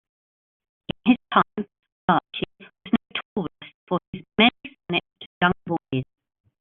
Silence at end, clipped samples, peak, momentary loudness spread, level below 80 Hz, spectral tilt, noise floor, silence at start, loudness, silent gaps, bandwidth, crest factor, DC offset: 0.6 s; under 0.1%; -4 dBFS; 17 LU; -58 dBFS; -3 dB/octave; under -90 dBFS; 1.05 s; -24 LUFS; 1.92-2.08 s, 3.25-3.36 s, 3.74-3.87 s, 4.07-4.13 s, 5.26-5.41 s; 4.2 kHz; 22 dB; under 0.1%